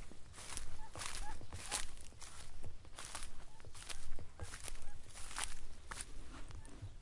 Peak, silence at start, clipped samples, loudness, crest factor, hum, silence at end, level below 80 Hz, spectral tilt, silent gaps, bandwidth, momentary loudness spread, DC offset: -18 dBFS; 0 s; under 0.1%; -49 LUFS; 22 dB; none; 0 s; -50 dBFS; -2 dB/octave; none; 11.5 kHz; 12 LU; under 0.1%